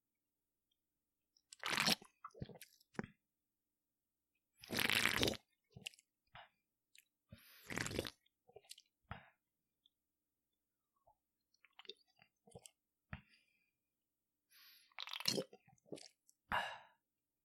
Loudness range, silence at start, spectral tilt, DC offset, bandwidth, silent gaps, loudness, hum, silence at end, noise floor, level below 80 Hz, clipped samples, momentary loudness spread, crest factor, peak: 22 LU; 1.65 s; -2.5 dB/octave; under 0.1%; 16.5 kHz; none; -40 LUFS; none; 0.6 s; under -90 dBFS; -70 dBFS; under 0.1%; 26 LU; 34 dB; -14 dBFS